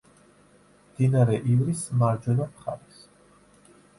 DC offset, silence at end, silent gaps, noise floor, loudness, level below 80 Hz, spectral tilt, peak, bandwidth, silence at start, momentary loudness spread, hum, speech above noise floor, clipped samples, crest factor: under 0.1%; 1.2 s; none; -57 dBFS; -25 LUFS; -58 dBFS; -8 dB/octave; -10 dBFS; 11.5 kHz; 1 s; 15 LU; 50 Hz at -50 dBFS; 34 dB; under 0.1%; 18 dB